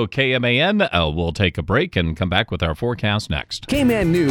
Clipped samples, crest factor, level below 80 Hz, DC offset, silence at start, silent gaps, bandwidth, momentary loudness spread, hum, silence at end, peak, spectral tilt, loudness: under 0.1%; 16 dB; -36 dBFS; under 0.1%; 0 s; none; 19.5 kHz; 6 LU; none; 0 s; -2 dBFS; -6 dB/octave; -19 LUFS